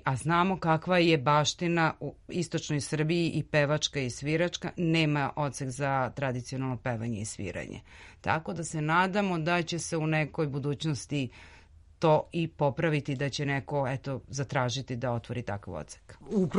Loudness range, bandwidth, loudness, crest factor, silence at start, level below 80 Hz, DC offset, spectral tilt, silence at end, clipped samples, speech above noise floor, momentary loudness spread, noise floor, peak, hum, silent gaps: 5 LU; 11.5 kHz; -29 LUFS; 20 dB; 0.05 s; -56 dBFS; under 0.1%; -5.5 dB/octave; 0 s; under 0.1%; 24 dB; 10 LU; -54 dBFS; -10 dBFS; none; none